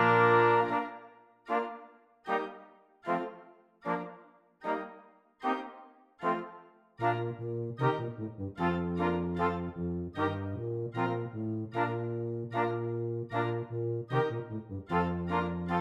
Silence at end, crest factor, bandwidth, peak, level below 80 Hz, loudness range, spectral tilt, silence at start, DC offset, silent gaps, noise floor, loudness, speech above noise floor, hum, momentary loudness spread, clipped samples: 0 s; 20 dB; 8 kHz; -12 dBFS; -66 dBFS; 5 LU; -8.5 dB/octave; 0 s; under 0.1%; none; -57 dBFS; -33 LUFS; 24 dB; none; 11 LU; under 0.1%